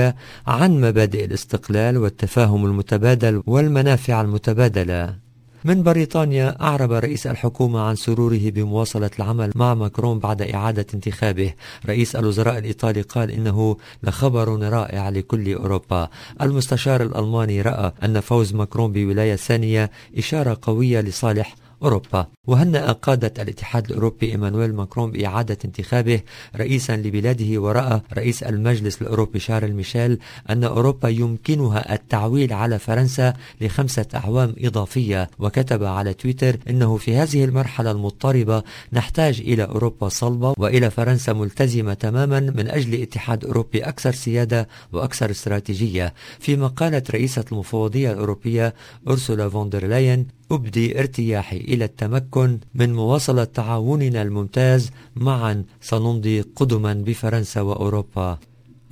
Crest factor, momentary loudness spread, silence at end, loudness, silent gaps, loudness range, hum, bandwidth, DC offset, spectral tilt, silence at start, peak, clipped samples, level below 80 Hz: 20 dB; 7 LU; 0.55 s; -20 LUFS; 22.37-22.44 s; 3 LU; none; 16 kHz; under 0.1%; -7 dB/octave; 0 s; 0 dBFS; under 0.1%; -40 dBFS